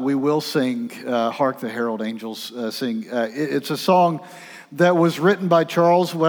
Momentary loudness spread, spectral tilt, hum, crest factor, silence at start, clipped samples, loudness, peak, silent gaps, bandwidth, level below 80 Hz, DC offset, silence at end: 12 LU; -6 dB/octave; none; 16 dB; 0 s; under 0.1%; -21 LUFS; -4 dBFS; none; over 20 kHz; -82 dBFS; under 0.1%; 0 s